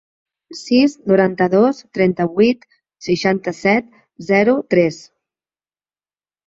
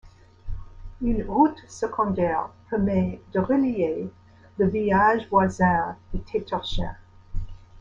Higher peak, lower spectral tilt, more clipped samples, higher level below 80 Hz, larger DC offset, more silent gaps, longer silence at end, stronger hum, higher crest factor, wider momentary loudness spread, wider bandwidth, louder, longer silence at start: first, -2 dBFS vs -6 dBFS; about the same, -6.5 dB/octave vs -7 dB/octave; neither; second, -58 dBFS vs -38 dBFS; neither; neither; first, 1.5 s vs 0 s; neither; about the same, 16 dB vs 18 dB; second, 15 LU vs 19 LU; about the same, 7.8 kHz vs 7.6 kHz; first, -16 LUFS vs -24 LUFS; first, 0.5 s vs 0.05 s